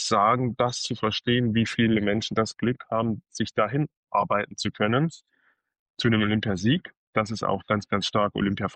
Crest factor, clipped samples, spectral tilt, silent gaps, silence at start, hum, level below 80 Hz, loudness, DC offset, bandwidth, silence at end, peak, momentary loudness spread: 16 dB; under 0.1%; -5.5 dB/octave; 3.97-4.03 s, 5.79-5.94 s, 6.97-7.13 s; 0 s; none; -56 dBFS; -25 LUFS; under 0.1%; 9.4 kHz; 0 s; -10 dBFS; 6 LU